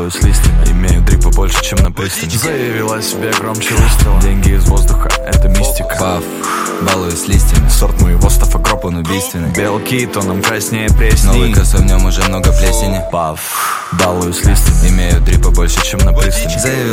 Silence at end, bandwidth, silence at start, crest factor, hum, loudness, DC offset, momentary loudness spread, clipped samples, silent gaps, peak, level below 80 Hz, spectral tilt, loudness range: 0 s; 16.5 kHz; 0 s; 10 dB; none; -13 LUFS; under 0.1%; 5 LU; under 0.1%; none; 0 dBFS; -12 dBFS; -4.5 dB/octave; 1 LU